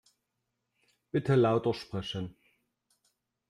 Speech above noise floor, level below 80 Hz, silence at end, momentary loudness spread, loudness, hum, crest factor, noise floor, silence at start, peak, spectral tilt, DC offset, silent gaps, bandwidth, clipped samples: 55 dB; -66 dBFS; 1.2 s; 13 LU; -30 LUFS; none; 18 dB; -83 dBFS; 1.15 s; -14 dBFS; -7.5 dB/octave; under 0.1%; none; 11.5 kHz; under 0.1%